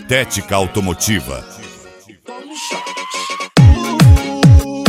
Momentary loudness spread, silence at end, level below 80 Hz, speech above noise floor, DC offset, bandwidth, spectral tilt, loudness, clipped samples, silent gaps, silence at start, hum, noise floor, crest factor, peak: 20 LU; 0 s; -22 dBFS; 23 dB; under 0.1%; 16 kHz; -5.5 dB/octave; -13 LUFS; under 0.1%; none; 0 s; none; -41 dBFS; 14 dB; 0 dBFS